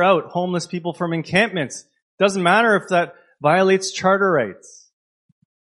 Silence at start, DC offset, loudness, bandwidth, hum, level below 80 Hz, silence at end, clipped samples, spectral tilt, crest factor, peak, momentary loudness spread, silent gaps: 0 s; under 0.1%; -19 LUFS; 11.5 kHz; none; -64 dBFS; 1.1 s; under 0.1%; -5 dB/octave; 18 dB; 0 dBFS; 11 LU; 2.02-2.18 s